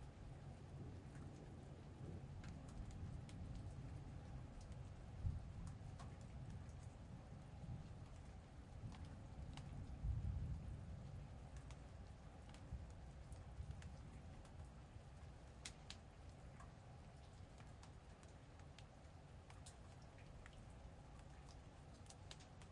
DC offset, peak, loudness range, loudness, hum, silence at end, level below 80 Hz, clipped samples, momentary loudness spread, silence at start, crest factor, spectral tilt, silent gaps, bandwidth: under 0.1%; -32 dBFS; 8 LU; -57 LUFS; none; 0 s; -60 dBFS; under 0.1%; 10 LU; 0 s; 22 dB; -6 dB/octave; none; 11 kHz